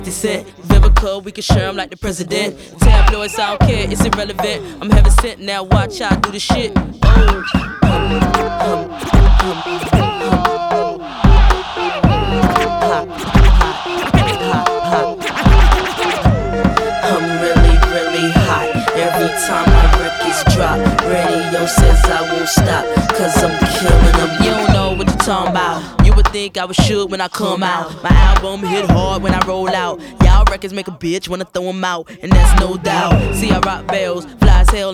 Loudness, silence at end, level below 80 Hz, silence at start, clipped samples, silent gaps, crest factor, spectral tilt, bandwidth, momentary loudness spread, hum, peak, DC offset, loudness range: -14 LUFS; 0 s; -16 dBFS; 0 s; 0.2%; none; 12 dB; -5.5 dB/octave; 14.5 kHz; 8 LU; none; 0 dBFS; under 0.1%; 2 LU